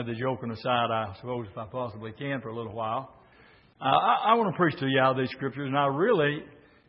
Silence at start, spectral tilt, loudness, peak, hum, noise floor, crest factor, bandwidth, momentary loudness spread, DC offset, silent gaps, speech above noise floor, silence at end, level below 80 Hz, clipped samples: 0 s; -10 dB/octave; -27 LUFS; -8 dBFS; none; -57 dBFS; 20 dB; 5.8 kHz; 13 LU; under 0.1%; none; 30 dB; 0.35 s; -66 dBFS; under 0.1%